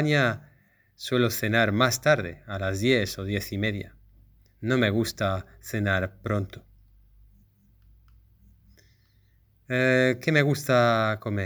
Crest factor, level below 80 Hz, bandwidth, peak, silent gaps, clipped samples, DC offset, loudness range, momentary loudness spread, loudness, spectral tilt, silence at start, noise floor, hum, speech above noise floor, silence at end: 22 dB; -56 dBFS; over 20 kHz; -4 dBFS; none; under 0.1%; under 0.1%; 8 LU; 13 LU; -25 LUFS; -5.5 dB/octave; 0 s; -62 dBFS; none; 37 dB; 0 s